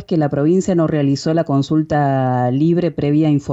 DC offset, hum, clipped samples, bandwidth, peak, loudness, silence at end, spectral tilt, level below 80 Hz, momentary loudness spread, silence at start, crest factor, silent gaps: under 0.1%; none; under 0.1%; 8 kHz; -6 dBFS; -16 LUFS; 0 s; -8 dB/octave; -50 dBFS; 2 LU; 0 s; 10 dB; none